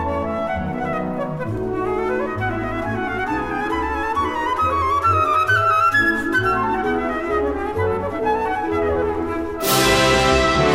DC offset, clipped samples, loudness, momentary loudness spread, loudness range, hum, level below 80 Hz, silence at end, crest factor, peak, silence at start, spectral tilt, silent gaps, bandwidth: 0.5%; under 0.1%; -19 LUFS; 9 LU; 5 LU; none; -36 dBFS; 0 s; 18 dB; -2 dBFS; 0 s; -4.5 dB/octave; none; 16 kHz